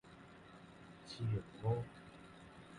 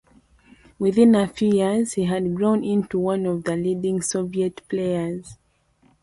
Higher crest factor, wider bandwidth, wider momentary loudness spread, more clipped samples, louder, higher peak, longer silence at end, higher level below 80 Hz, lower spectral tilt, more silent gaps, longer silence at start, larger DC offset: about the same, 20 dB vs 16 dB; about the same, 11 kHz vs 11.5 kHz; first, 18 LU vs 9 LU; neither; second, -42 LUFS vs -22 LUFS; second, -26 dBFS vs -6 dBFS; second, 0 s vs 0.7 s; second, -64 dBFS vs -56 dBFS; first, -7.5 dB/octave vs -6 dB/octave; neither; second, 0.05 s vs 0.8 s; neither